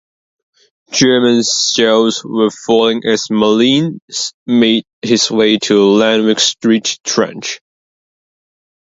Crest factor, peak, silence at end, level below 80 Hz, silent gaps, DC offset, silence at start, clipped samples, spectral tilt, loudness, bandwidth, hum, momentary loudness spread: 14 dB; 0 dBFS; 1.3 s; -56 dBFS; 4.02-4.08 s, 4.34-4.46 s, 4.93-5.02 s; under 0.1%; 0.9 s; under 0.1%; -3.5 dB/octave; -12 LUFS; 8 kHz; none; 9 LU